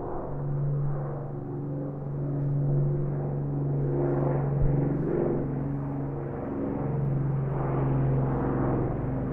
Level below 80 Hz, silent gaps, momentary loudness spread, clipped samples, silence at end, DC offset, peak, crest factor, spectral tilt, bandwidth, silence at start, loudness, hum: -40 dBFS; none; 7 LU; under 0.1%; 0 s; under 0.1%; -12 dBFS; 14 dB; -13 dB/octave; 2.7 kHz; 0 s; -29 LUFS; none